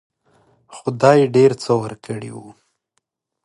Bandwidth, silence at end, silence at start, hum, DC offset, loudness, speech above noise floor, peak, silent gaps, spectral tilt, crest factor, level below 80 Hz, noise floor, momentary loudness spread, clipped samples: 11 kHz; 0.95 s; 0.7 s; none; under 0.1%; -16 LUFS; 56 dB; 0 dBFS; none; -6.5 dB/octave; 20 dB; -62 dBFS; -72 dBFS; 18 LU; under 0.1%